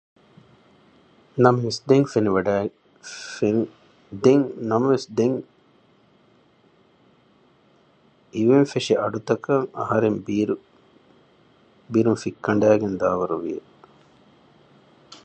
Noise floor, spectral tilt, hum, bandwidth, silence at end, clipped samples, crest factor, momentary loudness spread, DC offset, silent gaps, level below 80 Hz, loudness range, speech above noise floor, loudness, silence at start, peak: -58 dBFS; -6.5 dB/octave; none; 8.8 kHz; 0.1 s; under 0.1%; 22 dB; 14 LU; under 0.1%; none; -60 dBFS; 5 LU; 38 dB; -22 LUFS; 1.35 s; -2 dBFS